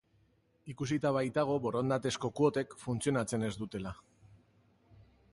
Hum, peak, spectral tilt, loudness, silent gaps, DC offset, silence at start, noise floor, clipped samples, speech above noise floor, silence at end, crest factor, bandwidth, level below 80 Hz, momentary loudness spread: none; -16 dBFS; -6 dB/octave; -34 LUFS; none; under 0.1%; 0.65 s; -71 dBFS; under 0.1%; 37 dB; 1.4 s; 20 dB; 11.5 kHz; -64 dBFS; 12 LU